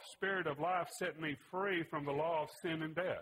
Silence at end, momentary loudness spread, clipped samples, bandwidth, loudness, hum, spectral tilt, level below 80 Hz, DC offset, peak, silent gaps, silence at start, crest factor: 0 s; 4 LU; under 0.1%; 16 kHz; -39 LUFS; none; -5 dB/octave; -76 dBFS; under 0.1%; -24 dBFS; none; 0 s; 16 dB